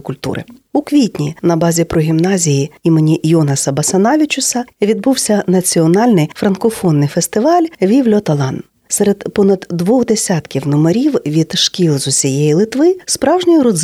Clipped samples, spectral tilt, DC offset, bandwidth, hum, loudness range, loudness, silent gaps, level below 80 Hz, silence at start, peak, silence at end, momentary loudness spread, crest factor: under 0.1%; -5 dB/octave; under 0.1%; 15.5 kHz; none; 2 LU; -13 LUFS; none; -48 dBFS; 0.05 s; -2 dBFS; 0 s; 5 LU; 12 dB